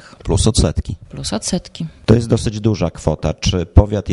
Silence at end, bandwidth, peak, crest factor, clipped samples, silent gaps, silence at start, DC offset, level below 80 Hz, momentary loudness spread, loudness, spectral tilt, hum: 0 s; 11.5 kHz; 0 dBFS; 16 dB; 0.1%; none; 0.25 s; under 0.1%; -24 dBFS; 10 LU; -17 LUFS; -6 dB/octave; none